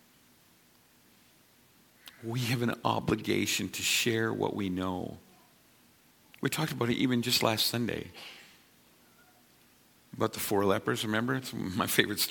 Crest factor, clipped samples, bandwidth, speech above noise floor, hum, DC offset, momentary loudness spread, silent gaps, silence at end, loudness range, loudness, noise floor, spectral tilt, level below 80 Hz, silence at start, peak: 26 dB; under 0.1%; 17.5 kHz; 33 dB; none; under 0.1%; 12 LU; none; 0 s; 4 LU; -30 LUFS; -63 dBFS; -4 dB/octave; -64 dBFS; 2.05 s; -8 dBFS